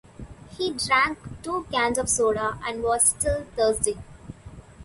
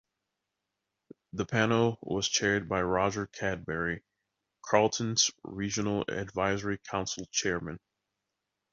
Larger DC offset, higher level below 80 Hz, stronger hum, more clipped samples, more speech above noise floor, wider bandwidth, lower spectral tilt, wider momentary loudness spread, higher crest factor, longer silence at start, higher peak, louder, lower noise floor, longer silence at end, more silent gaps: neither; first, -44 dBFS vs -56 dBFS; neither; neither; second, 20 dB vs 55 dB; first, 12 kHz vs 7.8 kHz; about the same, -2.5 dB/octave vs -3.5 dB/octave; first, 23 LU vs 10 LU; about the same, 20 dB vs 24 dB; second, 0.2 s vs 1.35 s; about the same, -6 dBFS vs -8 dBFS; first, -23 LUFS vs -30 LUFS; second, -44 dBFS vs -86 dBFS; second, 0 s vs 0.95 s; neither